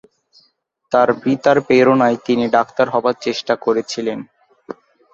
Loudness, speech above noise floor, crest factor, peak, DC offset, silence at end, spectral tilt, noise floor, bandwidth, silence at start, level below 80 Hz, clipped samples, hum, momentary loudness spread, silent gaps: -16 LUFS; 20 dB; 16 dB; -2 dBFS; under 0.1%; 0.4 s; -5.5 dB/octave; -36 dBFS; 7.8 kHz; 0.9 s; -60 dBFS; under 0.1%; none; 18 LU; none